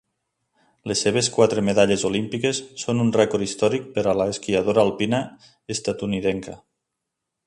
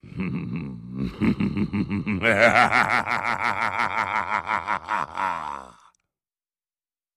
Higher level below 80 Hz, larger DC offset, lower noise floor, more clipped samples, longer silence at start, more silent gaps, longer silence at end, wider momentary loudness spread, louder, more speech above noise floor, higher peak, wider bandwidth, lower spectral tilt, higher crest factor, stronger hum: about the same, -54 dBFS vs -50 dBFS; neither; second, -82 dBFS vs under -90 dBFS; neither; first, 0.85 s vs 0.05 s; neither; second, 0.9 s vs 1.45 s; second, 9 LU vs 14 LU; about the same, -22 LUFS vs -23 LUFS; second, 60 dB vs over 67 dB; about the same, -4 dBFS vs -2 dBFS; second, 11 kHz vs 13.5 kHz; about the same, -4.5 dB/octave vs -5.5 dB/octave; about the same, 20 dB vs 24 dB; neither